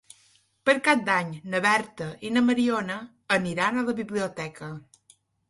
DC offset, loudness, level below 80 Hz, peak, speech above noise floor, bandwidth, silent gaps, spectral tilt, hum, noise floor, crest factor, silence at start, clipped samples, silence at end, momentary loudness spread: under 0.1%; -25 LUFS; -66 dBFS; -6 dBFS; 37 dB; 11.5 kHz; none; -4.5 dB/octave; none; -63 dBFS; 22 dB; 0.65 s; under 0.1%; 0.7 s; 14 LU